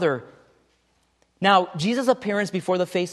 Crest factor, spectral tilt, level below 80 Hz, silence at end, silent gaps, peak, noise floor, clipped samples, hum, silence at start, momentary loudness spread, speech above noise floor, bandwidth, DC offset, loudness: 20 dB; -5 dB/octave; -68 dBFS; 0 s; none; -4 dBFS; -66 dBFS; under 0.1%; none; 0 s; 6 LU; 44 dB; 12.5 kHz; under 0.1%; -22 LUFS